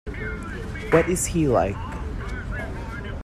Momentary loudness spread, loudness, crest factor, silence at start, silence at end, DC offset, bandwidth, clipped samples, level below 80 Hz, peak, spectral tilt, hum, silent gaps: 12 LU; -25 LUFS; 22 dB; 0.05 s; 0 s; under 0.1%; 14 kHz; under 0.1%; -34 dBFS; -4 dBFS; -5.5 dB/octave; none; none